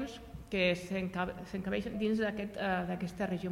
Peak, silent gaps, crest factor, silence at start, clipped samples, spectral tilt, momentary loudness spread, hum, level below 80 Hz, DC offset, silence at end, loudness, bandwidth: -18 dBFS; none; 18 dB; 0 s; under 0.1%; -6 dB/octave; 7 LU; none; -56 dBFS; under 0.1%; 0 s; -35 LUFS; 15.5 kHz